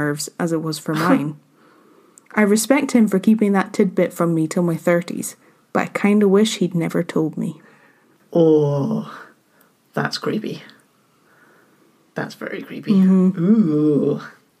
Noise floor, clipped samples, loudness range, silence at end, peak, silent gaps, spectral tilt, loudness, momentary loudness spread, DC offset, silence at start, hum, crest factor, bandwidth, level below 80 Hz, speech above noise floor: -58 dBFS; under 0.1%; 9 LU; 0.3 s; -2 dBFS; none; -6 dB/octave; -19 LUFS; 15 LU; under 0.1%; 0 s; none; 18 dB; 15.5 kHz; -72 dBFS; 40 dB